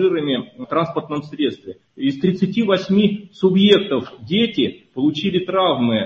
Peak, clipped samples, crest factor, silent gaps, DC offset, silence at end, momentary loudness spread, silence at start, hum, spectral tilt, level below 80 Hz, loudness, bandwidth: 0 dBFS; under 0.1%; 18 dB; none; under 0.1%; 0 s; 9 LU; 0 s; none; -7.5 dB/octave; -56 dBFS; -19 LUFS; 7.2 kHz